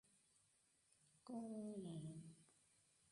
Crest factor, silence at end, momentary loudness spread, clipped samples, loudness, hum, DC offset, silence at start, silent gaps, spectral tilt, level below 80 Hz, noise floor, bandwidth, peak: 16 dB; 0.6 s; 12 LU; under 0.1%; -53 LUFS; none; under 0.1%; 0.15 s; none; -7 dB/octave; -88 dBFS; -80 dBFS; 11 kHz; -40 dBFS